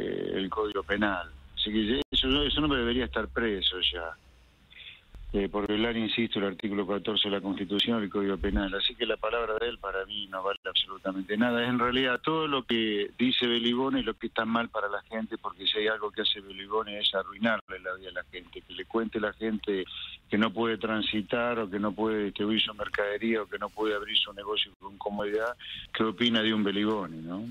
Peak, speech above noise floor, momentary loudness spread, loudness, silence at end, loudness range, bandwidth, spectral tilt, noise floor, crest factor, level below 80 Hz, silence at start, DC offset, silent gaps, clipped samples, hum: -12 dBFS; 28 dB; 10 LU; -29 LUFS; 0 s; 4 LU; 11 kHz; -6 dB/octave; -58 dBFS; 18 dB; -48 dBFS; 0 s; under 0.1%; 2.05-2.12 s, 10.57-10.63 s, 17.61-17.67 s, 24.76-24.80 s; under 0.1%; none